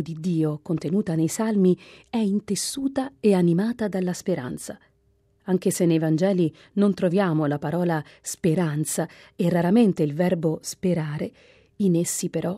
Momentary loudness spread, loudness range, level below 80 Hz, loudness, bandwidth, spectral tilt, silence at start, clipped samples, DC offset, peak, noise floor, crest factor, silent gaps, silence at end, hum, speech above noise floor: 9 LU; 2 LU; -62 dBFS; -24 LUFS; 16 kHz; -6 dB/octave; 0 s; under 0.1%; under 0.1%; -8 dBFS; -64 dBFS; 16 dB; none; 0 s; none; 41 dB